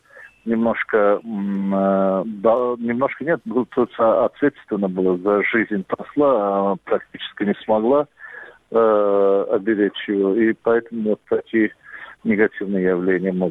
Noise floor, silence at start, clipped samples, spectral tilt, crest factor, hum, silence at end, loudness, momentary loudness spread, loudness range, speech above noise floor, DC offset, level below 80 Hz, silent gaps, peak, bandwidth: -40 dBFS; 0.15 s; under 0.1%; -9 dB/octave; 16 dB; none; 0 s; -20 LUFS; 7 LU; 2 LU; 21 dB; under 0.1%; -60 dBFS; none; -4 dBFS; 4 kHz